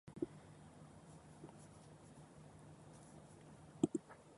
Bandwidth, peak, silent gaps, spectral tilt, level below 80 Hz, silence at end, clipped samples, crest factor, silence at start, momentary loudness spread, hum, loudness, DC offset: 11.5 kHz; -20 dBFS; none; -6.5 dB/octave; -74 dBFS; 0 s; under 0.1%; 30 dB; 0.05 s; 19 LU; none; -50 LUFS; under 0.1%